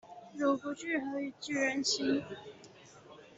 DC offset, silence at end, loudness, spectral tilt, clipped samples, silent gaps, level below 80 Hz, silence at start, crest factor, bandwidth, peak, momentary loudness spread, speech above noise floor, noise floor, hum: under 0.1%; 0.05 s; -33 LUFS; -3 dB/octave; under 0.1%; none; -76 dBFS; 0.05 s; 18 dB; 8.2 kHz; -18 dBFS; 24 LU; 21 dB; -55 dBFS; none